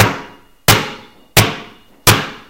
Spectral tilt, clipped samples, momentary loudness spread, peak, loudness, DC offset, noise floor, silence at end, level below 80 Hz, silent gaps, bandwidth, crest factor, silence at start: -3 dB/octave; 0.3%; 15 LU; 0 dBFS; -13 LUFS; under 0.1%; -37 dBFS; 0.1 s; -34 dBFS; none; over 20 kHz; 16 dB; 0 s